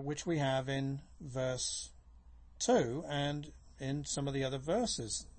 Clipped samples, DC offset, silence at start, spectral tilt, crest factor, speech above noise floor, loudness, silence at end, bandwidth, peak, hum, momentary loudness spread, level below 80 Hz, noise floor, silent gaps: under 0.1%; under 0.1%; 0 s; -4.5 dB/octave; 18 dB; 21 dB; -36 LUFS; 0 s; 8.8 kHz; -20 dBFS; none; 12 LU; -58 dBFS; -57 dBFS; none